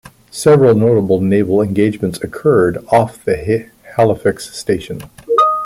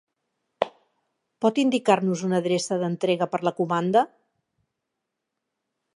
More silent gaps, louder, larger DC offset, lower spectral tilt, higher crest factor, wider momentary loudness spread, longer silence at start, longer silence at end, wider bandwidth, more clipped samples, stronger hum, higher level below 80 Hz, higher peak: neither; first, -14 LUFS vs -24 LUFS; neither; first, -7 dB/octave vs -5.5 dB/octave; second, 14 dB vs 22 dB; about the same, 11 LU vs 9 LU; second, 0.35 s vs 0.6 s; second, 0 s vs 1.9 s; first, 15.5 kHz vs 11 kHz; neither; neither; first, -46 dBFS vs -76 dBFS; first, 0 dBFS vs -4 dBFS